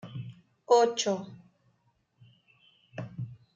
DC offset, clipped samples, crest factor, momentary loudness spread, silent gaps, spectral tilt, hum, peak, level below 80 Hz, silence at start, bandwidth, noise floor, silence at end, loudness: under 0.1%; under 0.1%; 22 dB; 23 LU; none; -4 dB/octave; none; -12 dBFS; -74 dBFS; 0.05 s; 8.8 kHz; -72 dBFS; 0.2 s; -27 LUFS